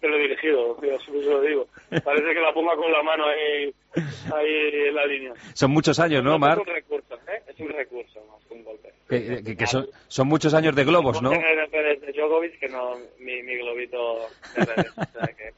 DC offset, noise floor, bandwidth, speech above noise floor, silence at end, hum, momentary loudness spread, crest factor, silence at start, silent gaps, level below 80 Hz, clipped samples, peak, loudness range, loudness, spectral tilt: under 0.1%; -48 dBFS; 8 kHz; 26 dB; 0.05 s; none; 13 LU; 18 dB; 0.05 s; none; -58 dBFS; under 0.1%; -6 dBFS; 6 LU; -23 LUFS; -4 dB/octave